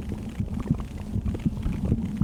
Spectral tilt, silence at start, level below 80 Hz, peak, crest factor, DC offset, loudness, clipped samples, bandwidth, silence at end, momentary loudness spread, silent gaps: -8.5 dB/octave; 0 s; -34 dBFS; -10 dBFS; 18 dB; under 0.1%; -30 LUFS; under 0.1%; 15.5 kHz; 0 s; 5 LU; none